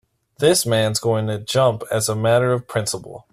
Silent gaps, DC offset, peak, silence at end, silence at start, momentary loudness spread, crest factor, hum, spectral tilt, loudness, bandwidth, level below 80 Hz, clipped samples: none; under 0.1%; -4 dBFS; 0.1 s; 0.4 s; 7 LU; 16 dB; none; -4.5 dB/octave; -19 LUFS; 15.5 kHz; -54 dBFS; under 0.1%